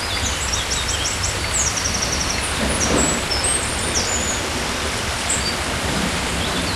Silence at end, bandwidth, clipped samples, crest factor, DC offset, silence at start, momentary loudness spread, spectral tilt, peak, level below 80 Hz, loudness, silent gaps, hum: 0 s; 15.5 kHz; under 0.1%; 16 dB; under 0.1%; 0 s; 4 LU; -2 dB/octave; -6 dBFS; -32 dBFS; -19 LUFS; none; none